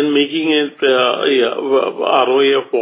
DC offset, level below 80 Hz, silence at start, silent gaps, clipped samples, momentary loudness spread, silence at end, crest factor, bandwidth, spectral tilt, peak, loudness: under 0.1%; -78 dBFS; 0 s; none; under 0.1%; 3 LU; 0 s; 14 dB; 4 kHz; -8 dB/octave; 0 dBFS; -14 LUFS